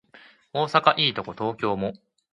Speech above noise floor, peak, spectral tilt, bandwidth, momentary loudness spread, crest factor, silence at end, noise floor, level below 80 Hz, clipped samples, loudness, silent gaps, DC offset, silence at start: 29 dB; -4 dBFS; -5.5 dB/octave; 11.5 kHz; 12 LU; 22 dB; 0.35 s; -53 dBFS; -62 dBFS; under 0.1%; -24 LUFS; none; under 0.1%; 0.55 s